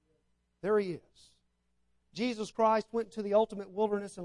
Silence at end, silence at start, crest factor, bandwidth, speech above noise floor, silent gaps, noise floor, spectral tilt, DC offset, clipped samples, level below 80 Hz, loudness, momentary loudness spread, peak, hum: 0 s; 0.65 s; 18 dB; 11 kHz; 45 dB; none; -77 dBFS; -5.5 dB/octave; under 0.1%; under 0.1%; -70 dBFS; -32 LUFS; 11 LU; -16 dBFS; 60 Hz at -70 dBFS